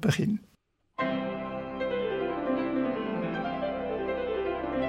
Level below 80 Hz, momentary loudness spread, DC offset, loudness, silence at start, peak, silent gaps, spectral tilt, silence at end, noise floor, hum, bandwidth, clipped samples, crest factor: -54 dBFS; 5 LU; under 0.1%; -31 LUFS; 0 s; -14 dBFS; none; -6.5 dB/octave; 0 s; -68 dBFS; none; 16 kHz; under 0.1%; 16 dB